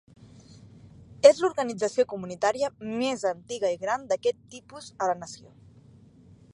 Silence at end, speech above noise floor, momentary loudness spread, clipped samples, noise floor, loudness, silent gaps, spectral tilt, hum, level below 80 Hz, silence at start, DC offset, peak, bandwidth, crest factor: 1.2 s; 28 dB; 23 LU; under 0.1%; -54 dBFS; -26 LUFS; none; -4 dB/octave; none; -64 dBFS; 0.65 s; under 0.1%; -2 dBFS; 11 kHz; 26 dB